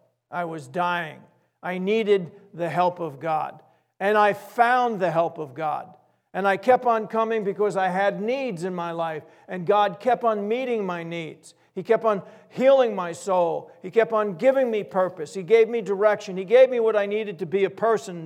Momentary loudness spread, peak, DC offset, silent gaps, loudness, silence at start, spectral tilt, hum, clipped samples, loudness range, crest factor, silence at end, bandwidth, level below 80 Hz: 13 LU; -4 dBFS; under 0.1%; none; -23 LUFS; 0.3 s; -6 dB/octave; none; under 0.1%; 4 LU; 18 dB; 0 s; 14.5 kHz; -80 dBFS